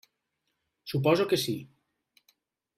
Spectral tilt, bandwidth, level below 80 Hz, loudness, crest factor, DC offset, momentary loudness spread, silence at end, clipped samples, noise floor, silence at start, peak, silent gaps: -5.5 dB/octave; 16 kHz; -68 dBFS; -28 LUFS; 20 dB; under 0.1%; 13 LU; 1.15 s; under 0.1%; -81 dBFS; 0.85 s; -12 dBFS; none